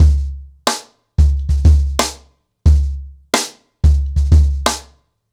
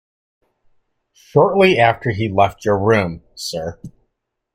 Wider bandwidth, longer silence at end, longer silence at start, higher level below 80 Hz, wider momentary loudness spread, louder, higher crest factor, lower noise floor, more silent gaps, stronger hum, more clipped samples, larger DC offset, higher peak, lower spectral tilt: second, 14 kHz vs 16 kHz; second, 0.5 s vs 0.65 s; second, 0 s vs 1.35 s; first, -16 dBFS vs -50 dBFS; about the same, 12 LU vs 14 LU; about the same, -17 LUFS vs -16 LUFS; second, 12 dB vs 18 dB; second, -49 dBFS vs -74 dBFS; neither; neither; neither; neither; about the same, -4 dBFS vs -2 dBFS; about the same, -5 dB/octave vs -6 dB/octave